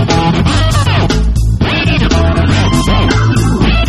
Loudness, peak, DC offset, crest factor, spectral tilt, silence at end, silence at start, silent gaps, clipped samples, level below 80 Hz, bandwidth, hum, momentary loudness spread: -11 LUFS; 0 dBFS; under 0.1%; 10 dB; -5.5 dB/octave; 0 s; 0 s; none; under 0.1%; -16 dBFS; 12.5 kHz; none; 2 LU